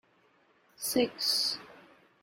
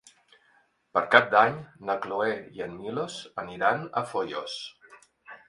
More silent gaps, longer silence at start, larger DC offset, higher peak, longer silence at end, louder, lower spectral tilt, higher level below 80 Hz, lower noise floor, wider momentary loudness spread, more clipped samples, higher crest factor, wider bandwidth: neither; second, 0.8 s vs 0.95 s; neither; second, -14 dBFS vs 0 dBFS; first, 0.45 s vs 0.15 s; second, -30 LUFS vs -27 LUFS; second, -1.5 dB/octave vs -4.5 dB/octave; about the same, -74 dBFS vs -70 dBFS; about the same, -67 dBFS vs -66 dBFS; second, 10 LU vs 17 LU; neither; second, 20 dB vs 28 dB; first, 16.5 kHz vs 11.5 kHz